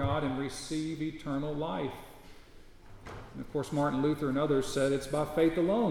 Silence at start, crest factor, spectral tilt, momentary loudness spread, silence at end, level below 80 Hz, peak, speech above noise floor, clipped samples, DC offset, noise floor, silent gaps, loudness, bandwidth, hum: 0 s; 16 dB; -6 dB/octave; 17 LU; 0 s; -52 dBFS; -14 dBFS; 21 dB; under 0.1%; under 0.1%; -52 dBFS; none; -32 LUFS; 16.5 kHz; none